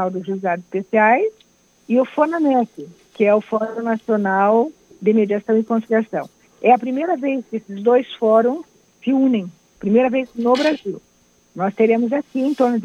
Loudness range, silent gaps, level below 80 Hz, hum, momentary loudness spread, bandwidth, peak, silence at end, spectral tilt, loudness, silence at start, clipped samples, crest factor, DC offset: 1 LU; none; -66 dBFS; none; 11 LU; 8.6 kHz; -2 dBFS; 0 s; -7 dB/octave; -19 LUFS; 0 s; under 0.1%; 18 dB; under 0.1%